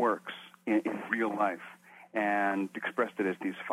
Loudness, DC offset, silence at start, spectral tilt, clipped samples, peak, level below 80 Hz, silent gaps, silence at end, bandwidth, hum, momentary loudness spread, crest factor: -32 LUFS; under 0.1%; 0 s; -6 dB/octave; under 0.1%; -14 dBFS; -82 dBFS; none; 0 s; 14 kHz; none; 11 LU; 18 dB